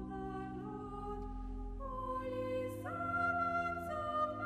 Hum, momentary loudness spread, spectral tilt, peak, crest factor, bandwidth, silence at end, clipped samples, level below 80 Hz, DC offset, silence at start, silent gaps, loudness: none; 10 LU; -7 dB/octave; -24 dBFS; 16 dB; 15 kHz; 0 s; under 0.1%; -50 dBFS; under 0.1%; 0 s; none; -40 LUFS